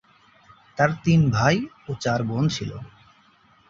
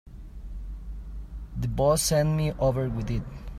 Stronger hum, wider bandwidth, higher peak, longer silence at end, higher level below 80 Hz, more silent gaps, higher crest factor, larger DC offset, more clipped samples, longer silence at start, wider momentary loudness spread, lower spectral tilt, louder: neither; second, 7.6 kHz vs 15.5 kHz; first, -4 dBFS vs -10 dBFS; first, 0.8 s vs 0 s; second, -50 dBFS vs -38 dBFS; neither; about the same, 20 dB vs 16 dB; neither; neither; first, 0.75 s vs 0.05 s; second, 15 LU vs 19 LU; about the same, -6 dB/octave vs -5.5 dB/octave; first, -22 LUFS vs -26 LUFS